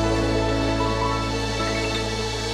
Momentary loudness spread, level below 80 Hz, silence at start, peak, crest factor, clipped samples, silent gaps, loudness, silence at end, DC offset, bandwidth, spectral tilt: 3 LU; -32 dBFS; 0 s; -10 dBFS; 14 dB; under 0.1%; none; -23 LUFS; 0 s; under 0.1%; 14 kHz; -5 dB/octave